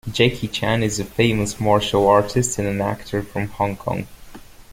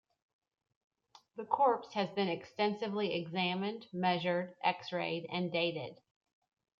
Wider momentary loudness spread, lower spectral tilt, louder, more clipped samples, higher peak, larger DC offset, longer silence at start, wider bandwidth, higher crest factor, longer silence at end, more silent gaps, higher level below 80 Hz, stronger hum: first, 11 LU vs 8 LU; second, -5 dB/octave vs -6.5 dB/octave; first, -20 LUFS vs -35 LUFS; neither; first, -2 dBFS vs -16 dBFS; neither; second, 0.05 s vs 1.35 s; first, 16.5 kHz vs 7.2 kHz; about the same, 20 dB vs 20 dB; second, 0 s vs 0.85 s; neither; first, -42 dBFS vs -82 dBFS; neither